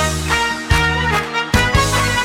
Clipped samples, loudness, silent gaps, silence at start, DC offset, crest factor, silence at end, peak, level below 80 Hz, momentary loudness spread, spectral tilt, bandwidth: under 0.1%; -16 LUFS; none; 0 s; under 0.1%; 16 dB; 0 s; 0 dBFS; -26 dBFS; 3 LU; -3.5 dB/octave; 17.5 kHz